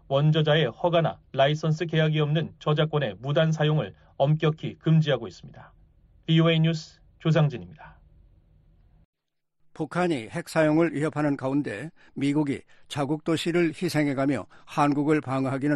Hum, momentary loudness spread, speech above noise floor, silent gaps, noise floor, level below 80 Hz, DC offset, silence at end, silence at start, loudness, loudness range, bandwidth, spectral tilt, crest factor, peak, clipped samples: none; 11 LU; 47 dB; 9.05-9.13 s; -72 dBFS; -60 dBFS; under 0.1%; 0 s; 0.1 s; -25 LUFS; 5 LU; 11.5 kHz; -7 dB/octave; 16 dB; -10 dBFS; under 0.1%